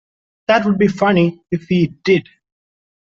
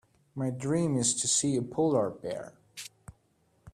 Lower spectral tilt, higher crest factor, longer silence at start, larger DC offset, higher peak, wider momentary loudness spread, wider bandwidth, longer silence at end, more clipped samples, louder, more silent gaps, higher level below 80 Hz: first, -7.5 dB/octave vs -4.5 dB/octave; about the same, 14 dB vs 18 dB; first, 0.5 s vs 0.35 s; neither; first, -2 dBFS vs -14 dBFS; second, 5 LU vs 19 LU; second, 7.4 kHz vs 14.5 kHz; first, 1 s vs 0.05 s; neither; first, -16 LUFS vs -29 LUFS; neither; first, -54 dBFS vs -64 dBFS